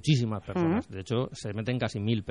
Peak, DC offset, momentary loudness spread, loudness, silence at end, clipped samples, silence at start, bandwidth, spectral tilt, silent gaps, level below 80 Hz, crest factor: -12 dBFS; under 0.1%; 5 LU; -30 LUFS; 0 s; under 0.1%; 0.05 s; 11 kHz; -6.5 dB/octave; none; -58 dBFS; 16 dB